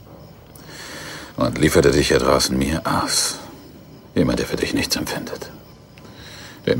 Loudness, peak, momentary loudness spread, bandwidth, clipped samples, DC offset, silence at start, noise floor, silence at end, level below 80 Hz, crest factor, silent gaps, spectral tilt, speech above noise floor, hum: -19 LUFS; -2 dBFS; 22 LU; 16.5 kHz; under 0.1%; under 0.1%; 0.1 s; -43 dBFS; 0 s; -38 dBFS; 20 dB; none; -4 dB/octave; 24 dB; none